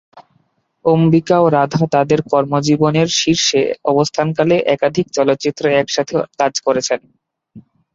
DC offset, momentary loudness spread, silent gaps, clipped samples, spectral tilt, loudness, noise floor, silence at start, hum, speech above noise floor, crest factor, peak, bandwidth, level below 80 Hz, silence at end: under 0.1%; 5 LU; none; under 0.1%; -5 dB/octave; -15 LUFS; -61 dBFS; 0.15 s; none; 47 dB; 14 dB; -2 dBFS; 7.8 kHz; -54 dBFS; 0.35 s